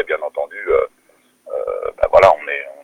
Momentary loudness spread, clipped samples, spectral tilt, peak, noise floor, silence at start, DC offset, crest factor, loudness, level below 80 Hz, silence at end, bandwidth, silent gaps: 14 LU; under 0.1%; -5 dB/octave; 0 dBFS; -56 dBFS; 0 s; under 0.1%; 18 dB; -17 LUFS; -44 dBFS; 0.1 s; 10.5 kHz; none